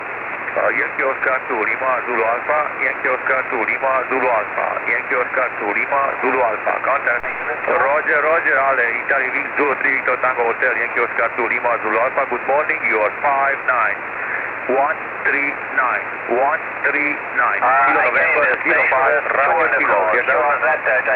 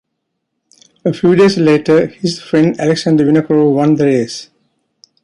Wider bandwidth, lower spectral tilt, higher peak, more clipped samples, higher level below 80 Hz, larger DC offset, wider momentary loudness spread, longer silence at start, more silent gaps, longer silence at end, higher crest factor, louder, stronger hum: second, 5.2 kHz vs 11 kHz; about the same, -7 dB/octave vs -6.5 dB/octave; second, -6 dBFS vs -2 dBFS; neither; about the same, -58 dBFS vs -54 dBFS; neither; second, 5 LU vs 10 LU; second, 0 s vs 1.05 s; neither; second, 0 s vs 0.8 s; about the same, 12 dB vs 12 dB; second, -17 LUFS vs -12 LUFS; neither